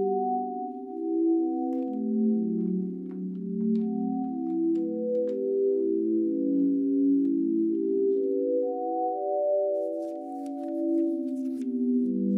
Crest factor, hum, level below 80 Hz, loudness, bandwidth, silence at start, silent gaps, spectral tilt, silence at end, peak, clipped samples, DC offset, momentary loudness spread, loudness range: 10 dB; none; -82 dBFS; -28 LUFS; 1.4 kHz; 0 s; none; -11.5 dB/octave; 0 s; -16 dBFS; under 0.1%; under 0.1%; 8 LU; 3 LU